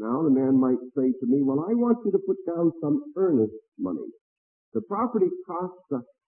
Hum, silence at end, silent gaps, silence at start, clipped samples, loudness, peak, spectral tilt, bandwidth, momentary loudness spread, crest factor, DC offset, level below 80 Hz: none; 0.25 s; 3.68-3.72 s, 4.21-4.72 s; 0 s; under 0.1%; -26 LUFS; -10 dBFS; -15 dB/octave; 2.3 kHz; 12 LU; 16 dB; under 0.1%; -74 dBFS